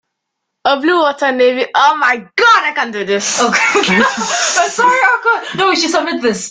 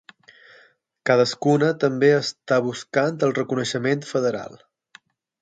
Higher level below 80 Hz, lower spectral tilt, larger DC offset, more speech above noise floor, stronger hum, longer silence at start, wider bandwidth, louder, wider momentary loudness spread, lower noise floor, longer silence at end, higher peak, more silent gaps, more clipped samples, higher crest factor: first, -58 dBFS vs -68 dBFS; second, -2 dB/octave vs -5.5 dB/octave; neither; first, 62 dB vs 36 dB; neither; second, 0.65 s vs 1.05 s; about the same, 9.6 kHz vs 9.2 kHz; first, -12 LUFS vs -21 LUFS; about the same, 6 LU vs 6 LU; first, -75 dBFS vs -57 dBFS; second, 0 s vs 0.85 s; about the same, 0 dBFS vs -2 dBFS; neither; neither; second, 12 dB vs 20 dB